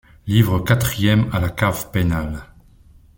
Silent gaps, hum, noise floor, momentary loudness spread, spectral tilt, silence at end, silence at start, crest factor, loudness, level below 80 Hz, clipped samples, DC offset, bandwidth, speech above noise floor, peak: none; none; -48 dBFS; 7 LU; -6 dB/octave; 0.75 s; 0.25 s; 18 dB; -19 LUFS; -36 dBFS; under 0.1%; under 0.1%; 17 kHz; 31 dB; -2 dBFS